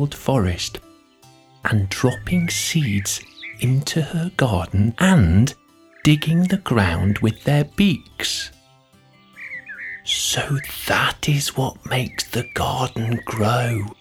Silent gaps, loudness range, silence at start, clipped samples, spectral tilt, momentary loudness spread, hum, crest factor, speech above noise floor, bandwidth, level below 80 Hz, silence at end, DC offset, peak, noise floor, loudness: none; 5 LU; 0 s; under 0.1%; -5 dB/octave; 10 LU; none; 20 dB; 34 dB; 20 kHz; -40 dBFS; 0.05 s; under 0.1%; -2 dBFS; -53 dBFS; -20 LUFS